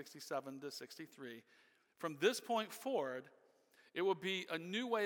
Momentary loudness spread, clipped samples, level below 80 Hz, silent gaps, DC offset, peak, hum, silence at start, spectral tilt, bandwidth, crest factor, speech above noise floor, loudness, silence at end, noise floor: 15 LU; under 0.1%; under -90 dBFS; none; under 0.1%; -20 dBFS; none; 0 s; -3.5 dB/octave; 18 kHz; 22 dB; 29 dB; -41 LUFS; 0 s; -71 dBFS